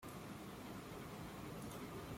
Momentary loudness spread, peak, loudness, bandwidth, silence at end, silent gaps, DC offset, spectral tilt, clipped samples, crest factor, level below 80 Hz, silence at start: 2 LU; -38 dBFS; -51 LUFS; 16.5 kHz; 0 s; none; under 0.1%; -5 dB/octave; under 0.1%; 12 dB; -66 dBFS; 0 s